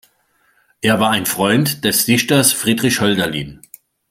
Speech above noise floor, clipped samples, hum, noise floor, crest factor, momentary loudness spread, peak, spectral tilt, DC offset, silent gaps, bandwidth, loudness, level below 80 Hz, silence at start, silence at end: 44 dB; under 0.1%; none; -60 dBFS; 18 dB; 8 LU; 0 dBFS; -3.5 dB/octave; under 0.1%; none; 16.5 kHz; -15 LUFS; -52 dBFS; 0.85 s; 0.55 s